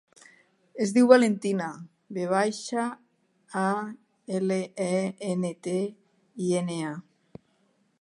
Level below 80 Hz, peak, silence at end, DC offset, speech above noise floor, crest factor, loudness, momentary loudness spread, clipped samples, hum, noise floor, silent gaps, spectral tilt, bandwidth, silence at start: -78 dBFS; -2 dBFS; 1 s; under 0.1%; 43 dB; 26 dB; -27 LUFS; 20 LU; under 0.1%; none; -68 dBFS; none; -5.5 dB/octave; 11.5 kHz; 0.75 s